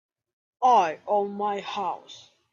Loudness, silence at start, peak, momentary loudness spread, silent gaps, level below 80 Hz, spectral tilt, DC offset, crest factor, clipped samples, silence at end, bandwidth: -25 LUFS; 0.6 s; -10 dBFS; 11 LU; none; -78 dBFS; -4.5 dB/octave; under 0.1%; 16 dB; under 0.1%; 0.35 s; 7.4 kHz